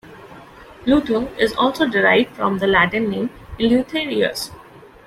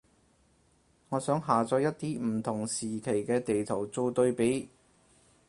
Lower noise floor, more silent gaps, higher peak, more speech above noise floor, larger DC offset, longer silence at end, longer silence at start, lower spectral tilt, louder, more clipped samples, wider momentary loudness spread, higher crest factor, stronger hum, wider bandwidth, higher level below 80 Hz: second, -41 dBFS vs -67 dBFS; neither; first, -2 dBFS vs -10 dBFS; second, 23 dB vs 37 dB; neither; second, 0.25 s vs 0.8 s; second, 0.05 s vs 1.1 s; about the same, -5 dB/octave vs -5.5 dB/octave; first, -18 LUFS vs -30 LUFS; neither; first, 10 LU vs 7 LU; about the same, 18 dB vs 20 dB; neither; first, 15.5 kHz vs 11.5 kHz; first, -46 dBFS vs -66 dBFS